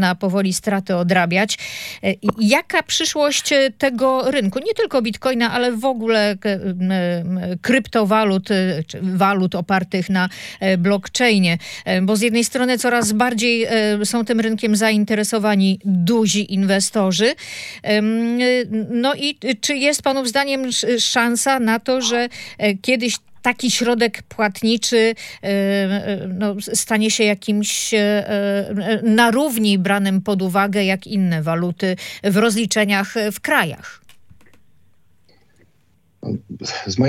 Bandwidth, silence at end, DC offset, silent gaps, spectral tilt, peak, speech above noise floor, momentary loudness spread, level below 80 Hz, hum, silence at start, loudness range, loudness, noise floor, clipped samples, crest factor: 16.5 kHz; 0 s; under 0.1%; none; -4 dB/octave; 0 dBFS; 42 dB; 7 LU; -60 dBFS; none; 0 s; 2 LU; -18 LUFS; -60 dBFS; under 0.1%; 18 dB